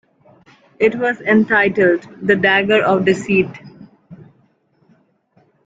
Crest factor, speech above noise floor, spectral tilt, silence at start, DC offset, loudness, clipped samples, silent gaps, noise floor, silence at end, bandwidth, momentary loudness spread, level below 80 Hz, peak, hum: 18 dB; 43 dB; -6 dB/octave; 0.8 s; under 0.1%; -15 LUFS; under 0.1%; none; -58 dBFS; 1.5 s; 7.8 kHz; 5 LU; -56 dBFS; 0 dBFS; none